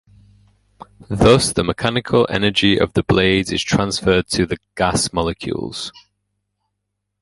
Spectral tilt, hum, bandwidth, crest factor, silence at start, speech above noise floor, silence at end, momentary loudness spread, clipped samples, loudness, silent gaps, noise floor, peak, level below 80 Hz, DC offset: -4.5 dB/octave; 50 Hz at -40 dBFS; 11.5 kHz; 18 dB; 1 s; 59 dB; 1.3 s; 11 LU; under 0.1%; -17 LUFS; none; -76 dBFS; 0 dBFS; -38 dBFS; under 0.1%